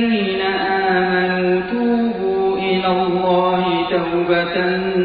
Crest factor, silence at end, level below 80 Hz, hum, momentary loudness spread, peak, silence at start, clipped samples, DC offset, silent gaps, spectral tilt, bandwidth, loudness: 14 dB; 0 s; -48 dBFS; none; 2 LU; -2 dBFS; 0 s; under 0.1%; under 0.1%; none; -3.5 dB/octave; 4.9 kHz; -17 LUFS